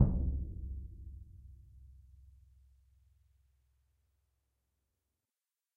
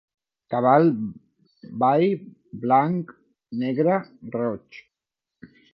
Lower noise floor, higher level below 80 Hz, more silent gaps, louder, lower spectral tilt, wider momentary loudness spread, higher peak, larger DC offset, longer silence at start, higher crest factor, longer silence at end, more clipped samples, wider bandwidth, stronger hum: about the same, under -90 dBFS vs -87 dBFS; first, -44 dBFS vs -68 dBFS; neither; second, -40 LUFS vs -23 LUFS; first, -12.5 dB/octave vs -10.5 dB/octave; first, 24 LU vs 17 LU; second, -14 dBFS vs -4 dBFS; neither; second, 0 s vs 0.5 s; first, 28 dB vs 20 dB; first, 3.85 s vs 0.3 s; neither; second, 1.7 kHz vs 5.8 kHz; neither